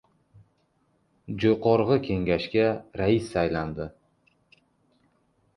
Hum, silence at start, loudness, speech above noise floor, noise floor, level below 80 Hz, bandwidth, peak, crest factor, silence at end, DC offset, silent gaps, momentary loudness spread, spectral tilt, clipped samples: none; 1.3 s; -25 LUFS; 44 dB; -69 dBFS; -50 dBFS; 11 kHz; -8 dBFS; 20 dB; 1.65 s; under 0.1%; none; 13 LU; -7.5 dB/octave; under 0.1%